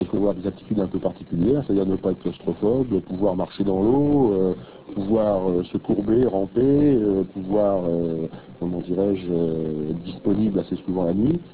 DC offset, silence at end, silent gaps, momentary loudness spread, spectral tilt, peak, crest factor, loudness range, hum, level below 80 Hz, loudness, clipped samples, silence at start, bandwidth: 0.3%; 0 s; none; 9 LU; -13 dB/octave; -8 dBFS; 14 dB; 3 LU; none; -46 dBFS; -22 LUFS; under 0.1%; 0 s; 4 kHz